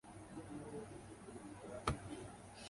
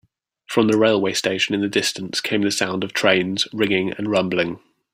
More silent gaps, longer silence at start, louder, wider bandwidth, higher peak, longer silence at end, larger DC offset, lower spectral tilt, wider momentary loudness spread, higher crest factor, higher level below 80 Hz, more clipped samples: neither; second, 0.05 s vs 0.5 s; second, -49 LUFS vs -20 LUFS; second, 11.5 kHz vs 16 kHz; second, -20 dBFS vs -2 dBFS; second, 0 s vs 0.35 s; neither; about the same, -5 dB/octave vs -4 dB/octave; first, 11 LU vs 6 LU; first, 28 dB vs 20 dB; about the same, -60 dBFS vs -62 dBFS; neither